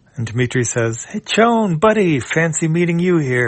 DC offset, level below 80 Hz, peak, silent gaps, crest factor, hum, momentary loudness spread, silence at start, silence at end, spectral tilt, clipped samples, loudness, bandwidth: under 0.1%; -52 dBFS; 0 dBFS; none; 16 dB; none; 7 LU; 0.15 s; 0 s; -5 dB/octave; under 0.1%; -16 LUFS; 8.8 kHz